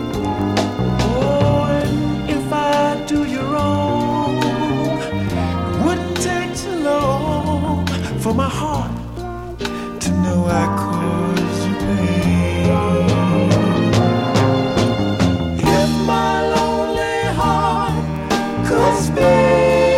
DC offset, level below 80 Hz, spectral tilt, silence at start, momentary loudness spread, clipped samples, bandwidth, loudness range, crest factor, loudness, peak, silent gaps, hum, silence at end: under 0.1%; -34 dBFS; -6 dB/octave; 0 s; 6 LU; under 0.1%; 16 kHz; 4 LU; 16 dB; -17 LUFS; -2 dBFS; none; none; 0 s